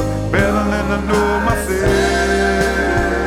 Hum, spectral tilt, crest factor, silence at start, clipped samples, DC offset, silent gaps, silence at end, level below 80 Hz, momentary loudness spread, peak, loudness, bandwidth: none; -5.5 dB/octave; 14 dB; 0 s; under 0.1%; under 0.1%; none; 0 s; -26 dBFS; 3 LU; -2 dBFS; -16 LUFS; 16.5 kHz